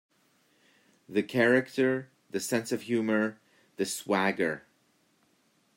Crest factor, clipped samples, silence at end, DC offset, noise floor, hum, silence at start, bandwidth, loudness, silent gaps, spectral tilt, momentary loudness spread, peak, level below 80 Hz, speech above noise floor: 20 dB; under 0.1%; 1.2 s; under 0.1%; -69 dBFS; none; 1.1 s; 16 kHz; -29 LUFS; none; -4.5 dB/octave; 11 LU; -10 dBFS; -78 dBFS; 41 dB